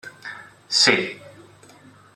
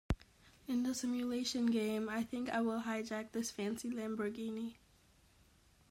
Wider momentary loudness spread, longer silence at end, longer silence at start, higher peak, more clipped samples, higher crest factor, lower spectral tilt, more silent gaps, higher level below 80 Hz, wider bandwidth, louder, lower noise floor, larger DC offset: first, 24 LU vs 8 LU; second, 0.85 s vs 1.2 s; about the same, 0.05 s vs 0.1 s; first, -2 dBFS vs -22 dBFS; neither; first, 24 dB vs 16 dB; second, -1.5 dB/octave vs -4.5 dB/octave; neither; second, -70 dBFS vs -56 dBFS; about the same, 15 kHz vs 16 kHz; first, -18 LUFS vs -39 LUFS; second, -49 dBFS vs -68 dBFS; neither